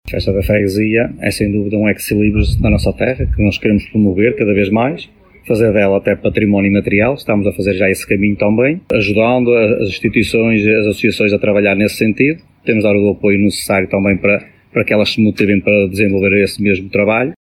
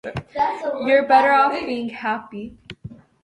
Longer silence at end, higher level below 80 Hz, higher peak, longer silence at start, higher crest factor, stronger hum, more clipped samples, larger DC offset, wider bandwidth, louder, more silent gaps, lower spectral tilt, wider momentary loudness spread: second, 0.1 s vs 0.3 s; first, -30 dBFS vs -54 dBFS; first, 0 dBFS vs -4 dBFS; about the same, 0.05 s vs 0.05 s; second, 12 dB vs 18 dB; neither; neither; neither; first, 16.5 kHz vs 11 kHz; first, -13 LUFS vs -19 LUFS; neither; about the same, -6.5 dB/octave vs -6 dB/octave; second, 4 LU vs 23 LU